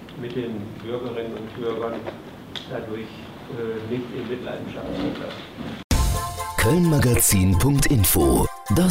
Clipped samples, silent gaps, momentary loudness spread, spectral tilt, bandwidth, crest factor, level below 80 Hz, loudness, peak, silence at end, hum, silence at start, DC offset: under 0.1%; 5.84-5.90 s; 17 LU; -5 dB/octave; 16 kHz; 14 dB; -32 dBFS; -23 LUFS; -8 dBFS; 0 s; none; 0 s; under 0.1%